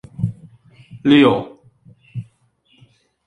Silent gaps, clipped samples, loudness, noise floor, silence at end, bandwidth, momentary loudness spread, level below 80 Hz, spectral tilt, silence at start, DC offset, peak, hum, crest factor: none; under 0.1%; -16 LUFS; -59 dBFS; 1.05 s; 8.8 kHz; 22 LU; -52 dBFS; -7.5 dB/octave; 0.2 s; under 0.1%; -2 dBFS; none; 18 dB